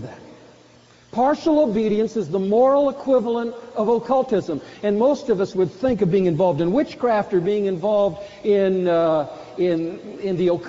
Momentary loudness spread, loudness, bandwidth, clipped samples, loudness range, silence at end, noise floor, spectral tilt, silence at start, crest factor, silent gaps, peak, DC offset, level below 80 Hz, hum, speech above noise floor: 8 LU; -20 LUFS; 7.6 kHz; under 0.1%; 1 LU; 0 s; -51 dBFS; -6.5 dB/octave; 0 s; 14 dB; none; -6 dBFS; under 0.1%; -54 dBFS; none; 31 dB